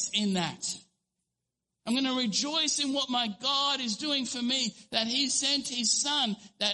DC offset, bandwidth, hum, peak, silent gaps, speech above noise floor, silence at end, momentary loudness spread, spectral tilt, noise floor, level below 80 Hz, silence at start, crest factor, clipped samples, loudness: under 0.1%; 11.5 kHz; none; -12 dBFS; none; 56 dB; 0 s; 6 LU; -2 dB/octave; -86 dBFS; -72 dBFS; 0 s; 20 dB; under 0.1%; -28 LUFS